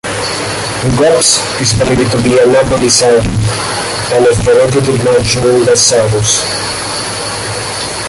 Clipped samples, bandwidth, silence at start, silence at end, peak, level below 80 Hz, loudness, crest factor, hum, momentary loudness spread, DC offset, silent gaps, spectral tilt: under 0.1%; 11.5 kHz; 0.05 s; 0 s; 0 dBFS; -32 dBFS; -10 LUFS; 10 dB; none; 9 LU; under 0.1%; none; -3.5 dB/octave